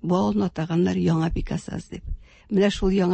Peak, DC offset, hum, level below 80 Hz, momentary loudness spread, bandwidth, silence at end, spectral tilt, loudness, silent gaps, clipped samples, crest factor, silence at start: -10 dBFS; under 0.1%; none; -36 dBFS; 16 LU; 8.8 kHz; 0 s; -7 dB/octave; -23 LUFS; none; under 0.1%; 14 dB; 0 s